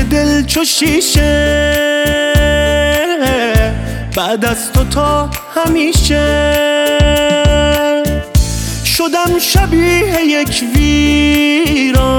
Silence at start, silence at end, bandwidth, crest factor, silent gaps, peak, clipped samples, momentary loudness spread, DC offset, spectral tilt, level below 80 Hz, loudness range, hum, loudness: 0 s; 0 s; 18.5 kHz; 12 dB; none; 0 dBFS; under 0.1%; 4 LU; under 0.1%; -4.5 dB/octave; -20 dBFS; 2 LU; none; -12 LUFS